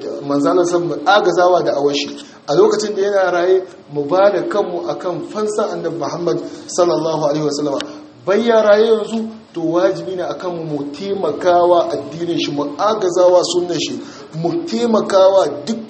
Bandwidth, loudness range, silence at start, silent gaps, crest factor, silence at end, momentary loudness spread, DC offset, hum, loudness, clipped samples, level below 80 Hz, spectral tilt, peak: 8.8 kHz; 4 LU; 0 s; none; 16 dB; 0 s; 11 LU; under 0.1%; none; -16 LUFS; under 0.1%; -64 dBFS; -5 dB/octave; 0 dBFS